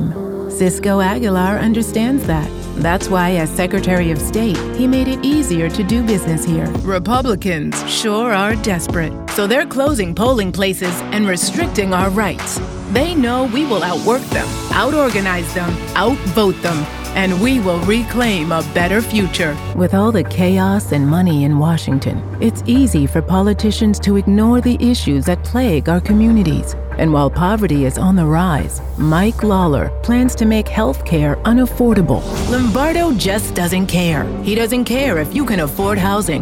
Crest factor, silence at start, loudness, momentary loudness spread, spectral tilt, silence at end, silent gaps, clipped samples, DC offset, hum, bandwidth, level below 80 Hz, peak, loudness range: 14 dB; 0 s; -16 LUFS; 5 LU; -5.5 dB/octave; 0 s; none; under 0.1%; under 0.1%; none; 17 kHz; -26 dBFS; 0 dBFS; 2 LU